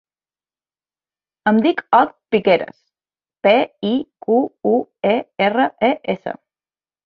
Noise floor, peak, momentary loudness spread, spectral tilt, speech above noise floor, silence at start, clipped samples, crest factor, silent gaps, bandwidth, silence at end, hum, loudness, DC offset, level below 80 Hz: under -90 dBFS; -2 dBFS; 8 LU; -8 dB/octave; over 73 dB; 1.45 s; under 0.1%; 18 dB; none; 5.4 kHz; 0.7 s; none; -18 LUFS; under 0.1%; -64 dBFS